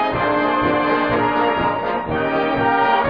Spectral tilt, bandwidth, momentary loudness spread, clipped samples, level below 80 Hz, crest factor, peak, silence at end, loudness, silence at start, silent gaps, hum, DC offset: -8 dB/octave; 5.4 kHz; 4 LU; under 0.1%; -44 dBFS; 12 dB; -6 dBFS; 0 s; -18 LUFS; 0 s; none; none; 0.3%